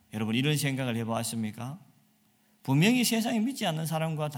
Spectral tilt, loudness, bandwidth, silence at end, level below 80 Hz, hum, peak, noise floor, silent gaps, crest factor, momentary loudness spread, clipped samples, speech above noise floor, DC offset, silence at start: -5 dB/octave; -28 LUFS; 18 kHz; 0 s; -70 dBFS; none; -10 dBFS; -67 dBFS; none; 20 dB; 15 LU; under 0.1%; 38 dB; under 0.1%; 0.15 s